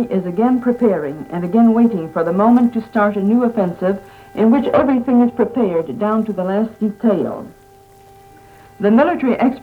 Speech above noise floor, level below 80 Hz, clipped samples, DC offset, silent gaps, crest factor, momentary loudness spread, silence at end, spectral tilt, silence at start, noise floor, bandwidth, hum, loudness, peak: 30 dB; -52 dBFS; under 0.1%; under 0.1%; none; 14 dB; 8 LU; 0.05 s; -9 dB/octave; 0 s; -45 dBFS; 4.5 kHz; none; -16 LUFS; -2 dBFS